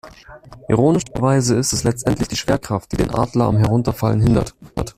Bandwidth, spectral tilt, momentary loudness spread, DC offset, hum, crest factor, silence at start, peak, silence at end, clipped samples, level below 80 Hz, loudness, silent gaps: 15 kHz; -6 dB/octave; 5 LU; under 0.1%; none; 16 dB; 0.05 s; -2 dBFS; 0.05 s; under 0.1%; -36 dBFS; -18 LUFS; none